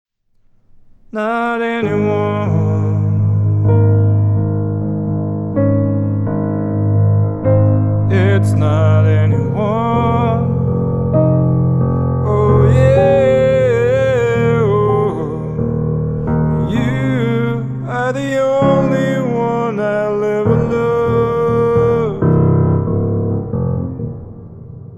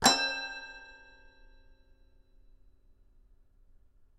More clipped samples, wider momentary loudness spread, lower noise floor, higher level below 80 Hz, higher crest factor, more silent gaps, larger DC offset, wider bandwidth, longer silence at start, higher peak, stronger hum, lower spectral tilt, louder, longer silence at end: neither; second, 7 LU vs 26 LU; second, -53 dBFS vs -61 dBFS; first, -36 dBFS vs -60 dBFS; second, 12 dB vs 28 dB; neither; neither; second, 8 kHz vs 13.5 kHz; first, 1.15 s vs 0 s; first, -2 dBFS vs -8 dBFS; neither; first, -9 dB/octave vs -1 dB/octave; first, -15 LUFS vs -31 LUFS; second, 0 s vs 3.25 s